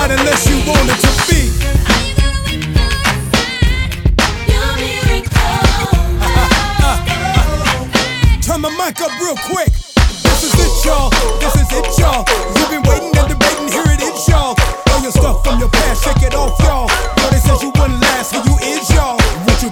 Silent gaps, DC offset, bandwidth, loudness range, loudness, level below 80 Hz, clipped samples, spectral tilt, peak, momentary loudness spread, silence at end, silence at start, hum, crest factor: none; under 0.1%; 19 kHz; 1 LU; -13 LUFS; -16 dBFS; 0.1%; -4 dB/octave; 0 dBFS; 4 LU; 0 s; 0 s; none; 12 dB